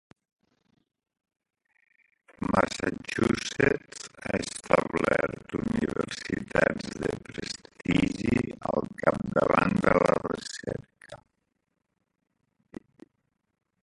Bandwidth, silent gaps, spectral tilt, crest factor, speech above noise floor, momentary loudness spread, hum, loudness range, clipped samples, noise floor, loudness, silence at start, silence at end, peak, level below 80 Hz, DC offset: 11.5 kHz; none; -5.5 dB/octave; 28 dB; 51 dB; 14 LU; none; 6 LU; under 0.1%; -79 dBFS; -28 LUFS; 2.4 s; 2.7 s; -2 dBFS; -52 dBFS; under 0.1%